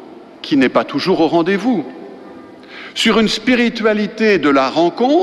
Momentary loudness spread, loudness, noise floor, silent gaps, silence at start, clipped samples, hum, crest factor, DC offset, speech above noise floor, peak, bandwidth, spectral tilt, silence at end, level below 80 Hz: 18 LU; -15 LUFS; -36 dBFS; none; 0 s; under 0.1%; none; 12 dB; under 0.1%; 22 dB; -2 dBFS; 13 kHz; -5 dB/octave; 0 s; -52 dBFS